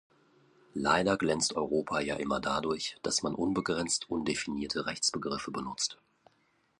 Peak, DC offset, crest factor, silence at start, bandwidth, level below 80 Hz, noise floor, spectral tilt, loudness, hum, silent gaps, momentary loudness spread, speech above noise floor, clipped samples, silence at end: -12 dBFS; under 0.1%; 22 dB; 0.75 s; 11.5 kHz; -60 dBFS; -71 dBFS; -3 dB/octave; -31 LUFS; none; none; 6 LU; 40 dB; under 0.1%; 0.85 s